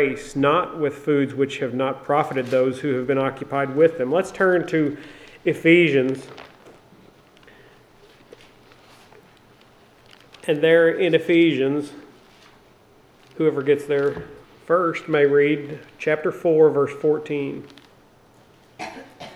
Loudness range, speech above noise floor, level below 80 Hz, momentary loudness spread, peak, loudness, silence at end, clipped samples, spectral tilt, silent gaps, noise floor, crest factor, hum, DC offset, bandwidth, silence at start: 4 LU; 33 dB; -60 dBFS; 16 LU; -2 dBFS; -20 LUFS; 0 s; under 0.1%; -6.5 dB/octave; none; -53 dBFS; 20 dB; none; under 0.1%; 12.5 kHz; 0 s